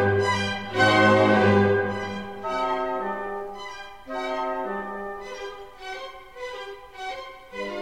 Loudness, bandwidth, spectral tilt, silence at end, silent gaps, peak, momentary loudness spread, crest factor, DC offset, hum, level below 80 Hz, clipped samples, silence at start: -24 LUFS; 12.5 kHz; -5.5 dB/octave; 0 s; none; -6 dBFS; 20 LU; 18 dB; 0.4%; none; -56 dBFS; under 0.1%; 0 s